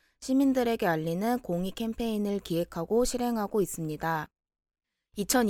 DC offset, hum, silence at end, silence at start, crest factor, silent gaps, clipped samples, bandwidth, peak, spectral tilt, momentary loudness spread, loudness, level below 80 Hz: under 0.1%; none; 0 s; 0.2 s; 20 dB; none; under 0.1%; 18 kHz; -10 dBFS; -5 dB/octave; 7 LU; -29 LUFS; -50 dBFS